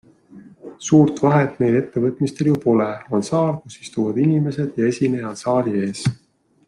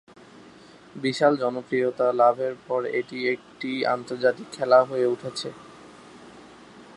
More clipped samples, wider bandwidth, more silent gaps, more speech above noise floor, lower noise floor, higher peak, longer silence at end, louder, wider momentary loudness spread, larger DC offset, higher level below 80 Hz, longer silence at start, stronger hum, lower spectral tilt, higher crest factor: neither; about the same, 11.5 kHz vs 11.5 kHz; neither; about the same, 26 dB vs 25 dB; second, -45 dBFS vs -49 dBFS; about the same, -2 dBFS vs -4 dBFS; first, 0.5 s vs 0.05 s; first, -19 LUFS vs -24 LUFS; second, 9 LU vs 12 LU; neither; first, -58 dBFS vs -72 dBFS; second, 0.35 s vs 0.95 s; neither; first, -7 dB/octave vs -5 dB/octave; about the same, 18 dB vs 20 dB